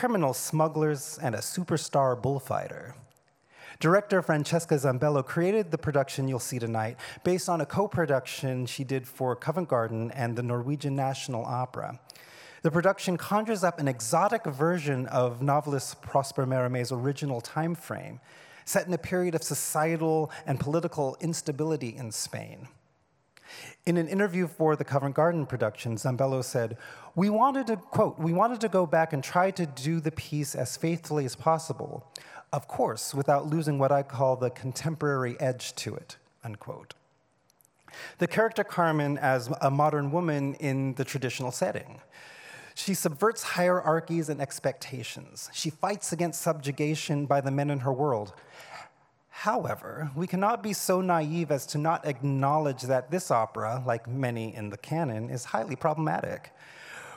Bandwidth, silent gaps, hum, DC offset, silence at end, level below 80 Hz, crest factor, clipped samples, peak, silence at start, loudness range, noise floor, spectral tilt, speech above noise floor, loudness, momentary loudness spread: 18 kHz; none; none; under 0.1%; 0 s; -70 dBFS; 20 dB; under 0.1%; -10 dBFS; 0 s; 4 LU; -69 dBFS; -5.5 dB/octave; 41 dB; -29 LUFS; 13 LU